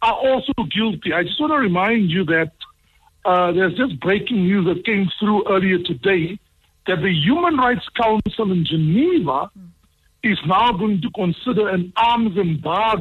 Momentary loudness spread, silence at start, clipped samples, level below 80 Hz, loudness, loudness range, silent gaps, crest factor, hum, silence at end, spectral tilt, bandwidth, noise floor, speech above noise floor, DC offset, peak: 5 LU; 0 s; under 0.1%; -48 dBFS; -19 LUFS; 1 LU; none; 12 dB; none; 0 s; -8 dB/octave; 5.6 kHz; -59 dBFS; 41 dB; under 0.1%; -6 dBFS